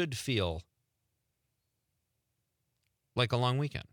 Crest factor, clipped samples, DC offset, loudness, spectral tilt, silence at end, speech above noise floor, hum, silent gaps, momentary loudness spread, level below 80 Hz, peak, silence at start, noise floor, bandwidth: 20 dB; under 0.1%; under 0.1%; -32 LUFS; -5.5 dB/octave; 0.1 s; 50 dB; none; none; 9 LU; -62 dBFS; -16 dBFS; 0 s; -82 dBFS; 18.5 kHz